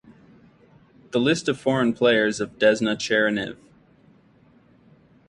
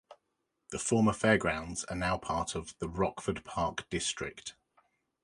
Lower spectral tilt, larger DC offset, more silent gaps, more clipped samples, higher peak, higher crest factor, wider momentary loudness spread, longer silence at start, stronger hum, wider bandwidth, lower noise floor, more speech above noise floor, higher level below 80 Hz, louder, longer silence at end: about the same, -4.5 dB/octave vs -4.5 dB/octave; neither; neither; neither; first, -6 dBFS vs -10 dBFS; about the same, 18 dB vs 22 dB; second, 7 LU vs 12 LU; first, 1.15 s vs 0.1 s; neither; about the same, 11 kHz vs 11.5 kHz; second, -56 dBFS vs -82 dBFS; second, 35 dB vs 50 dB; second, -62 dBFS vs -52 dBFS; first, -22 LUFS vs -32 LUFS; first, 1.75 s vs 0.7 s